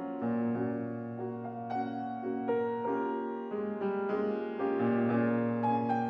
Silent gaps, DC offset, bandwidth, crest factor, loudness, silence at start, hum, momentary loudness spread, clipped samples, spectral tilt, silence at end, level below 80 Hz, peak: none; under 0.1%; 5.6 kHz; 14 dB; -33 LUFS; 0 s; none; 8 LU; under 0.1%; -10 dB/octave; 0 s; -78 dBFS; -18 dBFS